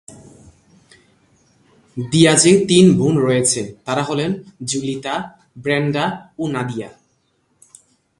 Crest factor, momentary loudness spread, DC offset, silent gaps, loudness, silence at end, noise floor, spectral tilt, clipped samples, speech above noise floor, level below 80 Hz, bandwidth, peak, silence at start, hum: 18 dB; 17 LU; under 0.1%; none; -17 LUFS; 1.3 s; -64 dBFS; -4.5 dB/octave; under 0.1%; 47 dB; -54 dBFS; 11.5 kHz; 0 dBFS; 0.1 s; none